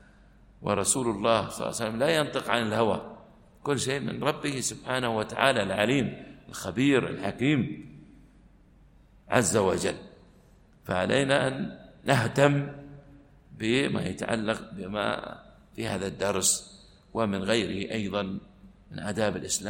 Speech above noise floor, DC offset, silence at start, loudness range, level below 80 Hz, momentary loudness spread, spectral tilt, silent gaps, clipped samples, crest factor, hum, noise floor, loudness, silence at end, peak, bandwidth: 30 dB; under 0.1%; 0.6 s; 3 LU; -56 dBFS; 14 LU; -4 dB/octave; none; under 0.1%; 24 dB; none; -57 dBFS; -28 LUFS; 0 s; -6 dBFS; 16.5 kHz